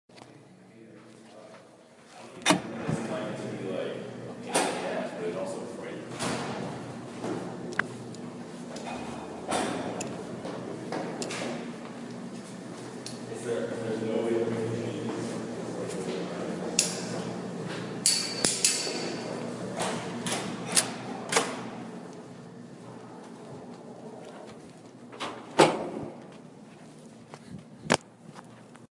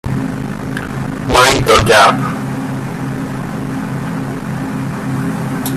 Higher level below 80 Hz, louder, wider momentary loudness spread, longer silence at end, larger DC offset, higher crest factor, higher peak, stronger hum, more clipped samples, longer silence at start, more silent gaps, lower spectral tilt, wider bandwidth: second, -70 dBFS vs -34 dBFS; second, -31 LUFS vs -15 LUFS; first, 23 LU vs 13 LU; about the same, 0.05 s vs 0 s; neither; first, 30 dB vs 16 dB; second, -4 dBFS vs 0 dBFS; neither; neither; about the same, 0.1 s vs 0.05 s; neither; second, -3 dB/octave vs -4.5 dB/octave; second, 11.5 kHz vs 15.5 kHz